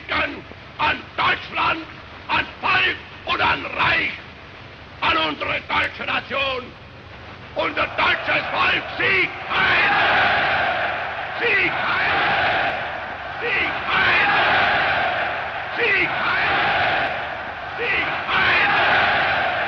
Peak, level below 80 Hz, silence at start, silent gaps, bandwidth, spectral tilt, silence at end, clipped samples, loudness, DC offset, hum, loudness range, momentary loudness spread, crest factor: -6 dBFS; -48 dBFS; 0 s; none; 7 kHz; -4.5 dB/octave; 0 s; under 0.1%; -19 LUFS; under 0.1%; none; 4 LU; 13 LU; 14 dB